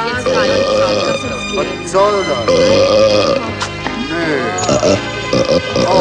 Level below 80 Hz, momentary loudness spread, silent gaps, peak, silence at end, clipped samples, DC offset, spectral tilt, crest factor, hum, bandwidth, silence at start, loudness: -38 dBFS; 8 LU; none; 0 dBFS; 0 s; under 0.1%; under 0.1%; -4 dB/octave; 14 dB; none; 10.5 kHz; 0 s; -14 LUFS